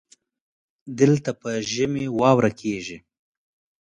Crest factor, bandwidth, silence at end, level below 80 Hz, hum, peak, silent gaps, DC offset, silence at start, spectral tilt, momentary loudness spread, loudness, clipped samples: 20 dB; 10 kHz; 0.8 s; -58 dBFS; none; -4 dBFS; none; under 0.1%; 0.85 s; -6 dB/octave; 16 LU; -22 LUFS; under 0.1%